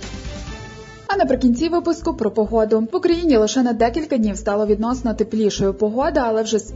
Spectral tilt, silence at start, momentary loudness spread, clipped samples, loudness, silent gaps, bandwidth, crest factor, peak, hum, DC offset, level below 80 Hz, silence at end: -5.5 dB/octave; 0 s; 16 LU; under 0.1%; -19 LUFS; none; 7.8 kHz; 14 dB; -4 dBFS; none; under 0.1%; -38 dBFS; 0 s